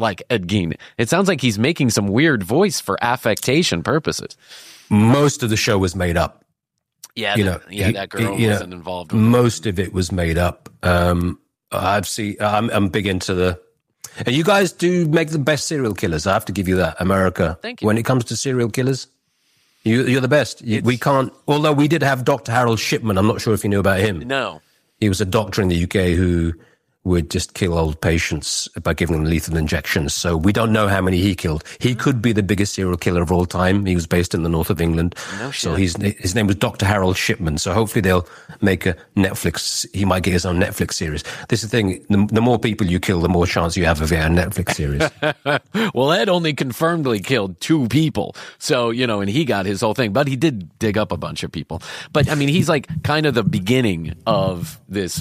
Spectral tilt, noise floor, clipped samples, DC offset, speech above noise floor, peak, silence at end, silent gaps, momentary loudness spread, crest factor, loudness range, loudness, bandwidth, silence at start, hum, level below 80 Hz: -5.5 dB/octave; -76 dBFS; under 0.1%; under 0.1%; 58 dB; -2 dBFS; 0 s; none; 7 LU; 16 dB; 2 LU; -19 LUFS; 15.5 kHz; 0 s; none; -38 dBFS